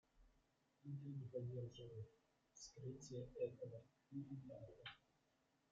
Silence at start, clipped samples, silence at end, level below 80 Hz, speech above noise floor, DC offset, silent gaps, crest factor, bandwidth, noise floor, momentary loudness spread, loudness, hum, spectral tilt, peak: 0.15 s; under 0.1%; 0.75 s; -78 dBFS; 30 dB; under 0.1%; none; 20 dB; 7.6 kHz; -83 dBFS; 12 LU; -54 LUFS; none; -7 dB/octave; -34 dBFS